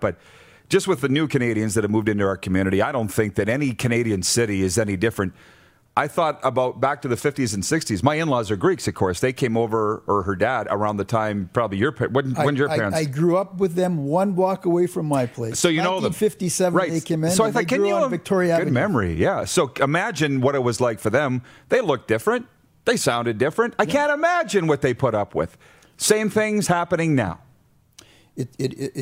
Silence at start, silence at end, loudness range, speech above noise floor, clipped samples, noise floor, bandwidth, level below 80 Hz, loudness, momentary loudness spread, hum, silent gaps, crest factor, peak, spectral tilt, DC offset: 0 s; 0 s; 2 LU; 36 dB; under 0.1%; -57 dBFS; 16 kHz; -52 dBFS; -21 LUFS; 4 LU; none; none; 20 dB; -2 dBFS; -5 dB/octave; under 0.1%